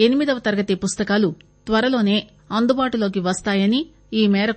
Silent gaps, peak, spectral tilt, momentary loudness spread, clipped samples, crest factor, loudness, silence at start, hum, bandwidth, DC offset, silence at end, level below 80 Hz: none; -2 dBFS; -5 dB/octave; 6 LU; under 0.1%; 18 dB; -20 LUFS; 0 s; none; 8.8 kHz; under 0.1%; 0 s; -50 dBFS